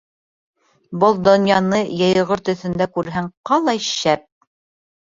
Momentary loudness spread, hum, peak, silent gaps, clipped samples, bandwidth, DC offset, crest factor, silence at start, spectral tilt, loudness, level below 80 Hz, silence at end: 9 LU; none; -2 dBFS; 3.37-3.44 s; under 0.1%; 7.6 kHz; under 0.1%; 18 dB; 0.9 s; -5 dB/octave; -18 LUFS; -54 dBFS; 0.85 s